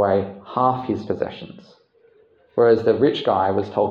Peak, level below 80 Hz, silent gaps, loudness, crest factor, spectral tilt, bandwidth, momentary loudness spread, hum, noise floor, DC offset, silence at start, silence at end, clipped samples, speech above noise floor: -4 dBFS; -64 dBFS; none; -20 LUFS; 16 dB; -8 dB/octave; 6.8 kHz; 12 LU; none; -56 dBFS; under 0.1%; 0 s; 0 s; under 0.1%; 36 dB